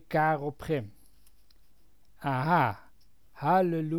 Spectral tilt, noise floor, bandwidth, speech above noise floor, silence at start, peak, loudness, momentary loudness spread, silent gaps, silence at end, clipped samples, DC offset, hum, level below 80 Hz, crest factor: -8 dB/octave; -65 dBFS; 19 kHz; 38 dB; 0.1 s; -12 dBFS; -29 LUFS; 11 LU; none; 0 s; under 0.1%; 0.2%; none; -60 dBFS; 18 dB